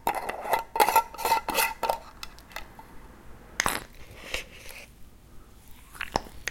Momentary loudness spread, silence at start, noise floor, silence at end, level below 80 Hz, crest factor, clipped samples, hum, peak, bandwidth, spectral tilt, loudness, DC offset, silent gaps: 23 LU; 0 s; -48 dBFS; 0 s; -50 dBFS; 28 dB; under 0.1%; none; -4 dBFS; 17 kHz; -1.5 dB/octave; -28 LUFS; under 0.1%; none